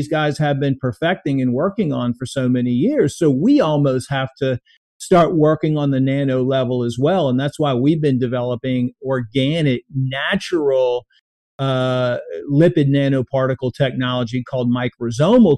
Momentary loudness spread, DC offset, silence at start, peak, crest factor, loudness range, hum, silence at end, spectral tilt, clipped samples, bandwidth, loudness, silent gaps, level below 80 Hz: 7 LU; under 0.1%; 0 s; -2 dBFS; 14 dB; 3 LU; none; 0 s; -7 dB/octave; under 0.1%; 12 kHz; -18 LUFS; 4.77-5.00 s, 11.21-11.59 s; -52 dBFS